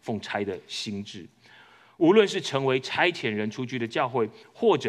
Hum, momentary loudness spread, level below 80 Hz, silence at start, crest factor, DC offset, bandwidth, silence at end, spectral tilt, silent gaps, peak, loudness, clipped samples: none; 12 LU; -76 dBFS; 0.05 s; 20 dB; under 0.1%; 11.5 kHz; 0 s; -5 dB/octave; none; -6 dBFS; -26 LUFS; under 0.1%